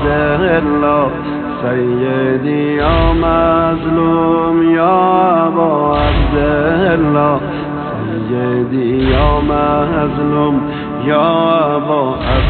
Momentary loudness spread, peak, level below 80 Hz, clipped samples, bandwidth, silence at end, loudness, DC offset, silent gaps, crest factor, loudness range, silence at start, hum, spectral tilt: 6 LU; 0 dBFS; -24 dBFS; under 0.1%; 4.5 kHz; 0 s; -13 LUFS; under 0.1%; none; 12 dB; 3 LU; 0 s; none; -11 dB/octave